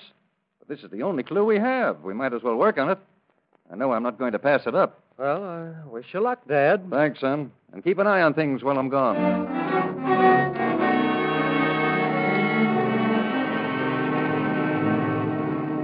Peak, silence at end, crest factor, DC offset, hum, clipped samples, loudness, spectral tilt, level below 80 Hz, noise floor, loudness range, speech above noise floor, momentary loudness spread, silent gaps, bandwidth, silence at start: -6 dBFS; 0 s; 18 dB; under 0.1%; none; under 0.1%; -23 LUFS; -11 dB/octave; -68 dBFS; -69 dBFS; 3 LU; 45 dB; 9 LU; none; 5.2 kHz; 0.7 s